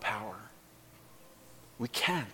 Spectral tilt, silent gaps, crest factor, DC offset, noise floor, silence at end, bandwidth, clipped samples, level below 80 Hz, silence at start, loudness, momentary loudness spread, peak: -3.5 dB/octave; none; 22 dB; under 0.1%; -58 dBFS; 0 s; 17.5 kHz; under 0.1%; -70 dBFS; 0 s; -34 LUFS; 26 LU; -18 dBFS